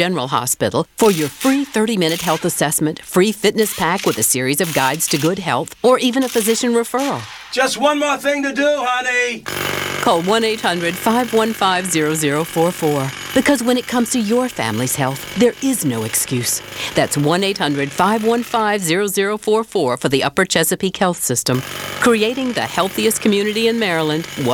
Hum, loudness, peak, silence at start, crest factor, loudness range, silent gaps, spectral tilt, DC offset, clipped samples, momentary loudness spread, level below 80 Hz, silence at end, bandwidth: none; -17 LUFS; 0 dBFS; 0 s; 18 dB; 1 LU; none; -3.5 dB/octave; under 0.1%; under 0.1%; 5 LU; -52 dBFS; 0 s; 19 kHz